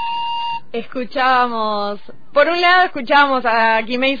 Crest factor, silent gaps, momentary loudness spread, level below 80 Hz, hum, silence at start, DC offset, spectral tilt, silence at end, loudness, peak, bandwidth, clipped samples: 14 dB; none; 13 LU; -52 dBFS; none; 0 s; 4%; -4.5 dB/octave; 0 s; -16 LUFS; -2 dBFS; 5 kHz; under 0.1%